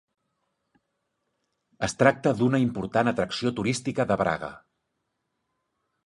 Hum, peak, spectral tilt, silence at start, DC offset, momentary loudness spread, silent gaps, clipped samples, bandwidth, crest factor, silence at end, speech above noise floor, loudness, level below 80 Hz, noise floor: none; -2 dBFS; -5.5 dB/octave; 1.8 s; under 0.1%; 10 LU; none; under 0.1%; 11.5 kHz; 26 dB; 1.5 s; 54 dB; -25 LUFS; -58 dBFS; -79 dBFS